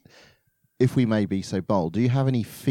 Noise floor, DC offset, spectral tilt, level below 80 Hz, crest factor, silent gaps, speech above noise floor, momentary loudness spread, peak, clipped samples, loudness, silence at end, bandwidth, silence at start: -66 dBFS; under 0.1%; -7.5 dB/octave; -60 dBFS; 16 dB; none; 43 dB; 5 LU; -8 dBFS; under 0.1%; -24 LUFS; 0 s; 15.5 kHz; 0.8 s